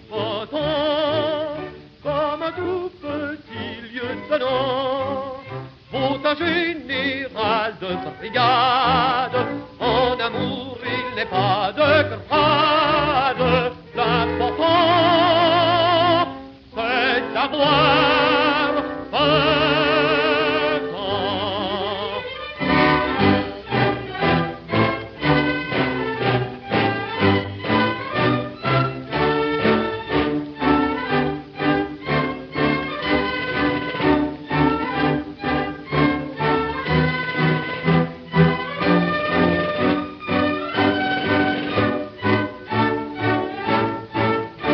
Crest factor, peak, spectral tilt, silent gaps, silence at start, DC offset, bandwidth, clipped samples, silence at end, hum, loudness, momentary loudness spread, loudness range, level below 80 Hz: 18 dB; -2 dBFS; -3.5 dB/octave; none; 0 s; under 0.1%; 6 kHz; under 0.1%; 0 s; none; -20 LUFS; 9 LU; 6 LU; -44 dBFS